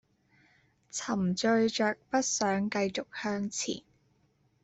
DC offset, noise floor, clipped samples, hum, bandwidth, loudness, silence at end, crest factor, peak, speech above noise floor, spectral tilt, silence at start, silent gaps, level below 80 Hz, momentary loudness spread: under 0.1%; -70 dBFS; under 0.1%; none; 8.2 kHz; -31 LUFS; 0.85 s; 18 dB; -16 dBFS; 40 dB; -4 dB/octave; 0.95 s; none; -70 dBFS; 9 LU